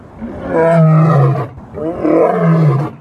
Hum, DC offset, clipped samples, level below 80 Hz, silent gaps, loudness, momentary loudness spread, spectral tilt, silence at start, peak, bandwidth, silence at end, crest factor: none; under 0.1%; under 0.1%; -44 dBFS; none; -12 LUFS; 15 LU; -10.5 dB/octave; 0.15 s; 0 dBFS; 5.2 kHz; 0.05 s; 12 dB